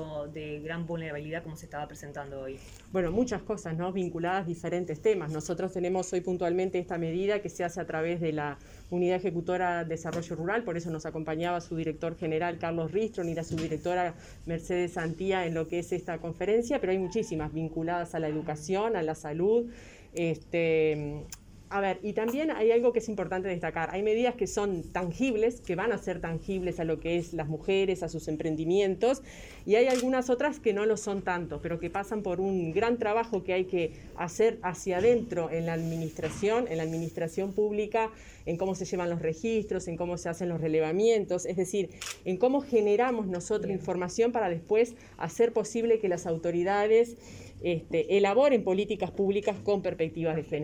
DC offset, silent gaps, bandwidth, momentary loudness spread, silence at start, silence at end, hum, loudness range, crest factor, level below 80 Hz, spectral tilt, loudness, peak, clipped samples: under 0.1%; none; 19 kHz; 10 LU; 0 s; 0 s; none; 4 LU; 18 dB; -54 dBFS; -6 dB/octave; -30 LUFS; -12 dBFS; under 0.1%